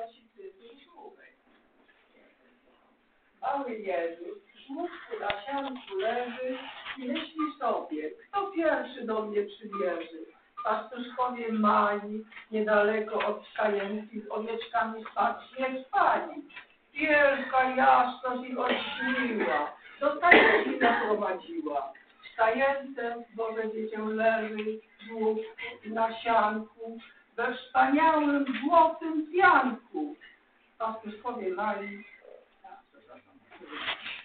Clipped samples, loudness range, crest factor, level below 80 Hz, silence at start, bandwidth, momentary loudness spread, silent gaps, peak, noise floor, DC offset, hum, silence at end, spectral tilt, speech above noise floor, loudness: under 0.1%; 12 LU; 26 dB; -68 dBFS; 0 s; 4.6 kHz; 17 LU; none; -4 dBFS; -67 dBFS; under 0.1%; none; 0 s; -1.5 dB/octave; 38 dB; -28 LUFS